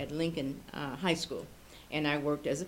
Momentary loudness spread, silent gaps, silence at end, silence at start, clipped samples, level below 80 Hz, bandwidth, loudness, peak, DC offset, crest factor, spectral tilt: 11 LU; none; 0 s; 0 s; under 0.1%; -58 dBFS; 17 kHz; -34 LUFS; -14 dBFS; under 0.1%; 20 dB; -5 dB/octave